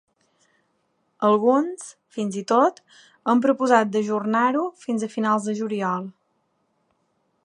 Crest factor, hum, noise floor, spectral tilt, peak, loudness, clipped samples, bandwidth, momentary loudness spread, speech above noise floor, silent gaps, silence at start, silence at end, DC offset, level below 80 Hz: 22 dB; none; -70 dBFS; -5.5 dB/octave; -2 dBFS; -22 LUFS; under 0.1%; 11 kHz; 11 LU; 48 dB; none; 1.2 s; 1.35 s; under 0.1%; -78 dBFS